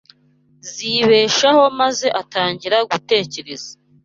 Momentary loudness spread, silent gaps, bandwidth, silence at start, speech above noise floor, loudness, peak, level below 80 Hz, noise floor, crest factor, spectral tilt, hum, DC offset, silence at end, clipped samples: 18 LU; none; 7.6 kHz; 0.65 s; 39 dB; -16 LUFS; -2 dBFS; -60 dBFS; -56 dBFS; 16 dB; -3 dB/octave; none; under 0.1%; 0.3 s; under 0.1%